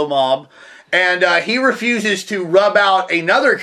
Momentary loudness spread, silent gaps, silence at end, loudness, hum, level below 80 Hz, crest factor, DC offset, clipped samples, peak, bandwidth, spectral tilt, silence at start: 6 LU; none; 0 s; -15 LUFS; none; -70 dBFS; 16 dB; under 0.1%; under 0.1%; 0 dBFS; 14 kHz; -3.5 dB/octave; 0 s